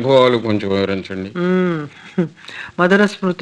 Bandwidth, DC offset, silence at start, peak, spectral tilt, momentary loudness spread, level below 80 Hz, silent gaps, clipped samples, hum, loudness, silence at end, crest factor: 9.6 kHz; under 0.1%; 0 s; 0 dBFS; -6.5 dB/octave; 13 LU; -60 dBFS; none; under 0.1%; none; -17 LUFS; 0.05 s; 16 dB